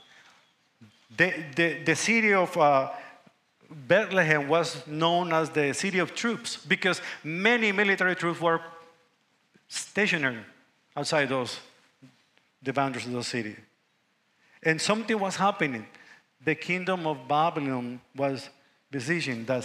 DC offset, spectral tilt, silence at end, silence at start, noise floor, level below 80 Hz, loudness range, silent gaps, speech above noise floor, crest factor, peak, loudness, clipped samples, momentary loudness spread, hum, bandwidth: under 0.1%; -4 dB/octave; 0 s; 0.8 s; -71 dBFS; -78 dBFS; 6 LU; none; 44 dB; 22 dB; -6 dBFS; -26 LUFS; under 0.1%; 13 LU; none; 15.5 kHz